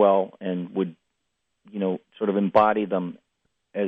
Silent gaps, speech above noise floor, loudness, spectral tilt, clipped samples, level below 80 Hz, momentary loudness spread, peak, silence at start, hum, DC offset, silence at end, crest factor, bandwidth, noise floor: none; 56 dB; -24 LUFS; -9.5 dB/octave; under 0.1%; -70 dBFS; 14 LU; -6 dBFS; 0 s; none; under 0.1%; 0 s; 18 dB; 5 kHz; -78 dBFS